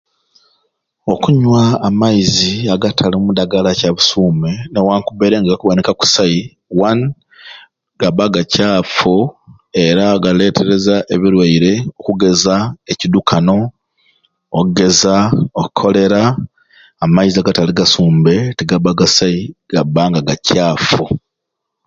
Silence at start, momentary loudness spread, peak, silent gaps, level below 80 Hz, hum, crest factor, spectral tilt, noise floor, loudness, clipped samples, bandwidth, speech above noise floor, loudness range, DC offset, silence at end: 1.05 s; 8 LU; 0 dBFS; none; -42 dBFS; none; 12 dB; -5 dB/octave; -77 dBFS; -13 LUFS; under 0.1%; 7.6 kHz; 64 dB; 2 LU; under 0.1%; 0.7 s